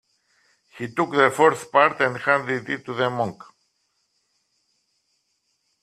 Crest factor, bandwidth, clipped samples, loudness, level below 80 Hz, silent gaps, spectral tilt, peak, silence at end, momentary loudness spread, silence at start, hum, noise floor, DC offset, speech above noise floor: 24 dB; 14 kHz; under 0.1%; -21 LUFS; -70 dBFS; none; -5 dB/octave; -2 dBFS; 2.5 s; 12 LU; 0.75 s; none; -72 dBFS; under 0.1%; 51 dB